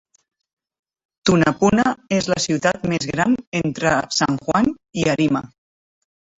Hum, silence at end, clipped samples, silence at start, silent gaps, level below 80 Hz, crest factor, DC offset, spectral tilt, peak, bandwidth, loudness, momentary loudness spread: none; 0.95 s; under 0.1%; 1.25 s; 3.47-3.52 s; -48 dBFS; 18 dB; under 0.1%; -5 dB/octave; -2 dBFS; 8.2 kHz; -19 LUFS; 6 LU